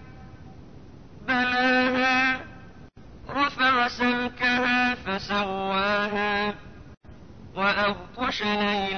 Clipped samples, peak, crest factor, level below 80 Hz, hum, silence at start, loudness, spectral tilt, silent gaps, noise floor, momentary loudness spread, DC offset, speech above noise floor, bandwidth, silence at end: under 0.1%; -12 dBFS; 14 dB; -52 dBFS; none; 0 s; -24 LUFS; -4.5 dB/octave; none; -47 dBFS; 9 LU; 0.3%; 21 dB; 6.6 kHz; 0 s